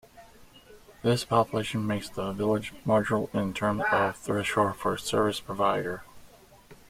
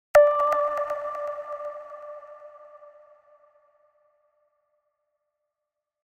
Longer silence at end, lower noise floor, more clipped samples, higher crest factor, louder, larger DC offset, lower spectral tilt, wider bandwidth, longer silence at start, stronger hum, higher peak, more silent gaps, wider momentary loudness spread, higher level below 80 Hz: second, 0.15 s vs 3.3 s; second, -53 dBFS vs -86 dBFS; neither; about the same, 20 dB vs 22 dB; second, -28 LUFS vs -25 LUFS; neither; first, -5.5 dB/octave vs -2.5 dB/octave; about the same, 16 kHz vs 16.5 kHz; about the same, 0.15 s vs 0.15 s; second, none vs 50 Hz at -100 dBFS; about the same, -8 dBFS vs -6 dBFS; neither; second, 6 LU vs 27 LU; first, -56 dBFS vs -66 dBFS